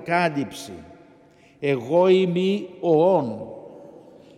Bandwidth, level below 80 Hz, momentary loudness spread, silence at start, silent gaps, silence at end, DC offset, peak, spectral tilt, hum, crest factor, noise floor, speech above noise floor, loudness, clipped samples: 13.5 kHz; -66 dBFS; 21 LU; 0 s; none; 0.55 s; under 0.1%; -6 dBFS; -6.5 dB/octave; none; 16 dB; -53 dBFS; 32 dB; -21 LUFS; under 0.1%